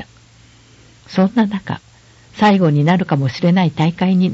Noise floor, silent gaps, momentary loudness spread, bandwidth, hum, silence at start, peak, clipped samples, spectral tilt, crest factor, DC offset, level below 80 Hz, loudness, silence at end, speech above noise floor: -47 dBFS; none; 10 LU; 7.8 kHz; none; 0 s; -2 dBFS; under 0.1%; -8 dB/octave; 14 dB; under 0.1%; -52 dBFS; -15 LUFS; 0 s; 32 dB